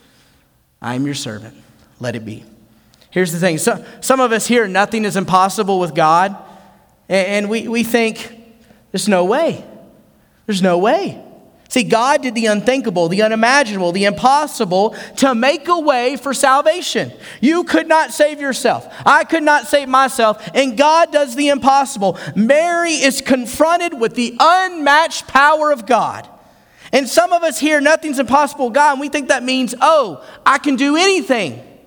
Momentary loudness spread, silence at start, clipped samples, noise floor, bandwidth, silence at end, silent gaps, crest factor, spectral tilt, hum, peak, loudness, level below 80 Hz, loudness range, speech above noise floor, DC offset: 9 LU; 0.8 s; under 0.1%; -56 dBFS; over 20 kHz; 0.25 s; none; 16 dB; -4 dB/octave; none; 0 dBFS; -14 LUFS; -56 dBFS; 5 LU; 41 dB; under 0.1%